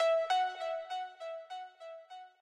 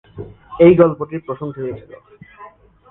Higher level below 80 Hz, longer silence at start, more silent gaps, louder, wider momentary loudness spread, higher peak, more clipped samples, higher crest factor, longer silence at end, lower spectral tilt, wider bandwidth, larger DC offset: second, -90 dBFS vs -48 dBFS; second, 0 s vs 0.15 s; neither; second, -36 LUFS vs -15 LUFS; second, 20 LU vs 25 LU; second, -22 dBFS vs 0 dBFS; neither; about the same, 14 dB vs 18 dB; second, 0.15 s vs 0.45 s; second, 2 dB/octave vs -11.5 dB/octave; first, 11 kHz vs 3.9 kHz; neither